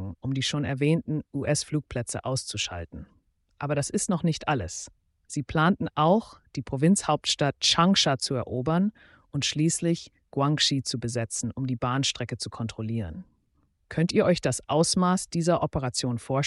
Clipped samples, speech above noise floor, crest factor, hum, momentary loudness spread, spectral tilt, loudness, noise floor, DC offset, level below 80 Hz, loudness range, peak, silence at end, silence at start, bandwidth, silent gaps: under 0.1%; 43 dB; 18 dB; none; 12 LU; -4.5 dB/octave; -26 LUFS; -69 dBFS; under 0.1%; -54 dBFS; 6 LU; -8 dBFS; 0 s; 0 s; 11.5 kHz; none